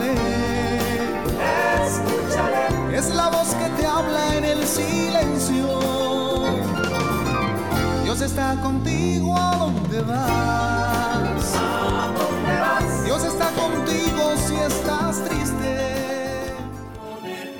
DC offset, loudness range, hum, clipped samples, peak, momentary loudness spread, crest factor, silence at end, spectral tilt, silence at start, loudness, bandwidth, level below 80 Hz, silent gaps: 0.6%; 1 LU; none; under 0.1%; -8 dBFS; 4 LU; 14 dB; 0 s; -4.5 dB/octave; 0 s; -22 LUFS; 19 kHz; -36 dBFS; none